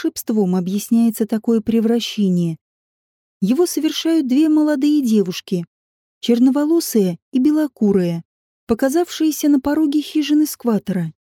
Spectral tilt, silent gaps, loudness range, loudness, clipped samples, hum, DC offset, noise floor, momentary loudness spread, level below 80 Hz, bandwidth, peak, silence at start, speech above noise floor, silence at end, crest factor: -6 dB/octave; 2.61-3.40 s, 5.67-6.21 s, 7.22-7.32 s, 8.25-8.67 s; 2 LU; -18 LUFS; under 0.1%; none; under 0.1%; under -90 dBFS; 8 LU; -56 dBFS; 17.5 kHz; -4 dBFS; 0 s; over 73 dB; 0.1 s; 14 dB